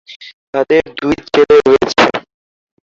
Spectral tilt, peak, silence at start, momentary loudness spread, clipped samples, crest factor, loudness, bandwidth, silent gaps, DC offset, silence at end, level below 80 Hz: -4.5 dB/octave; 0 dBFS; 0.1 s; 11 LU; under 0.1%; 14 dB; -12 LUFS; 7.6 kHz; 0.16-0.20 s, 0.33-0.53 s; under 0.1%; 0.7 s; -44 dBFS